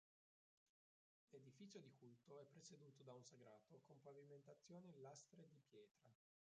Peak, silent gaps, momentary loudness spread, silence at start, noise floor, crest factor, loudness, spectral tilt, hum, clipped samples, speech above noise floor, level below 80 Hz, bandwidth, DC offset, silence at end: -48 dBFS; 5.91-5.95 s; 6 LU; 1.3 s; under -90 dBFS; 18 dB; -66 LUFS; -6 dB/octave; none; under 0.1%; over 24 dB; under -90 dBFS; 7.6 kHz; under 0.1%; 0.35 s